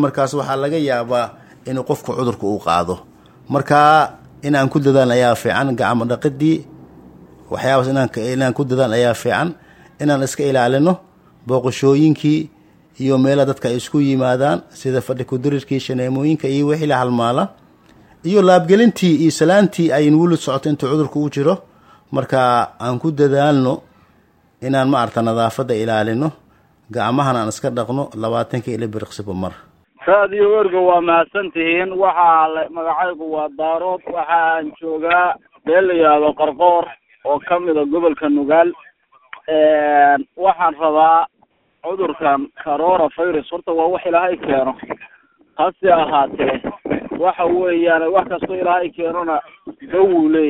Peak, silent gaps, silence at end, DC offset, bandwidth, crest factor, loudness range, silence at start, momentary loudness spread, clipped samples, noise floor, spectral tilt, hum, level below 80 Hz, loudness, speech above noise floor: 0 dBFS; none; 0 s; under 0.1%; 16 kHz; 16 dB; 4 LU; 0 s; 11 LU; under 0.1%; -59 dBFS; -6.5 dB/octave; none; -56 dBFS; -16 LUFS; 43 dB